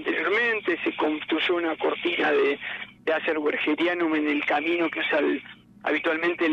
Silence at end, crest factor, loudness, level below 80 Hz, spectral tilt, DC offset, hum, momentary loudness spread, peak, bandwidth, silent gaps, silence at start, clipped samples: 0 s; 12 dB; -25 LUFS; -68 dBFS; -5 dB/octave; under 0.1%; none; 5 LU; -12 dBFS; 7 kHz; none; 0 s; under 0.1%